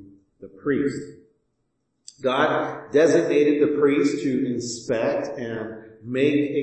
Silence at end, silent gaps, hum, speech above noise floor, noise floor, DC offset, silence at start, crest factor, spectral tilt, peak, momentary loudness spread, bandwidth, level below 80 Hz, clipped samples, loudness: 0 s; none; none; 52 dB; -74 dBFS; under 0.1%; 0 s; 16 dB; -5.5 dB/octave; -6 dBFS; 13 LU; 8.8 kHz; -66 dBFS; under 0.1%; -22 LUFS